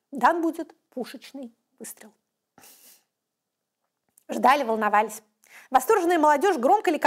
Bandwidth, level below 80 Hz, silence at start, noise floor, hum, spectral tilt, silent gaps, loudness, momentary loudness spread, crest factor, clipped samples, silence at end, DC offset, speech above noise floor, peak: 16 kHz; -72 dBFS; 0.1 s; -83 dBFS; none; -3.5 dB/octave; none; -22 LUFS; 21 LU; 18 dB; under 0.1%; 0 s; under 0.1%; 60 dB; -6 dBFS